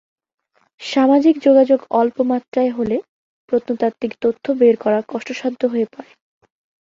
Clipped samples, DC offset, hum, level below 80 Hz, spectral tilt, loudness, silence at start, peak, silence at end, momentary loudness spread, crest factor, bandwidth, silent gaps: under 0.1%; under 0.1%; none; -62 dBFS; -6 dB/octave; -17 LUFS; 0.8 s; -2 dBFS; 0.85 s; 10 LU; 16 dB; 7.6 kHz; 2.48-2.52 s, 3.09-3.48 s